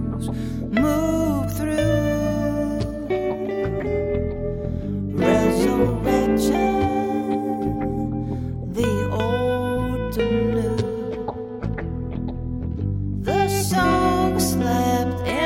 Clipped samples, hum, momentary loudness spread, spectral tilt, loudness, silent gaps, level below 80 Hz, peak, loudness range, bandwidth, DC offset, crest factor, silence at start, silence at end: under 0.1%; none; 9 LU; -6 dB/octave; -22 LUFS; none; -36 dBFS; -6 dBFS; 4 LU; 16.5 kHz; under 0.1%; 16 dB; 0 s; 0 s